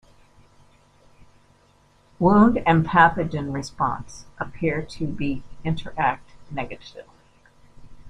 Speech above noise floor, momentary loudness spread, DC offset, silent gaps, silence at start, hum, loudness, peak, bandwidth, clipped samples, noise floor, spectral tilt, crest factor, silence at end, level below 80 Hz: 36 dB; 18 LU; under 0.1%; none; 2.2 s; none; -22 LUFS; -2 dBFS; 10.5 kHz; under 0.1%; -58 dBFS; -7 dB/octave; 22 dB; 0 s; -46 dBFS